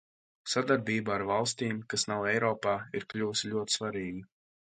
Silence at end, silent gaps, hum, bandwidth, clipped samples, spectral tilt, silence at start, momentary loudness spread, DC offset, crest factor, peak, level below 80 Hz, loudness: 0.5 s; none; none; 9.6 kHz; under 0.1%; -3.5 dB/octave; 0.45 s; 9 LU; under 0.1%; 20 dB; -12 dBFS; -66 dBFS; -31 LUFS